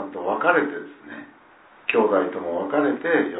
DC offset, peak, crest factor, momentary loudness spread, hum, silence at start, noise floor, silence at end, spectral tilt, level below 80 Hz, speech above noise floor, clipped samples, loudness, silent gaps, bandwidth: under 0.1%; -2 dBFS; 20 dB; 19 LU; none; 0 s; -51 dBFS; 0 s; -9 dB/octave; -72 dBFS; 30 dB; under 0.1%; -22 LUFS; none; 4 kHz